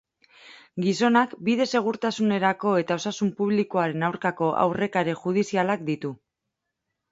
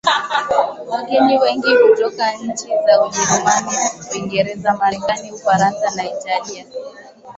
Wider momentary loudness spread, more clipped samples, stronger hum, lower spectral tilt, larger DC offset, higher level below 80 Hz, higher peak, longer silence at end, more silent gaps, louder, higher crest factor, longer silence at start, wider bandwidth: second, 6 LU vs 11 LU; neither; neither; first, -5.5 dB/octave vs -3 dB/octave; neither; second, -68 dBFS vs -56 dBFS; second, -6 dBFS vs 0 dBFS; first, 0.95 s vs 0.05 s; neither; second, -24 LUFS vs -16 LUFS; about the same, 18 dB vs 16 dB; first, 0.45 s vs 0.05 s; about the same, 8 kHz vs 8.2 kHz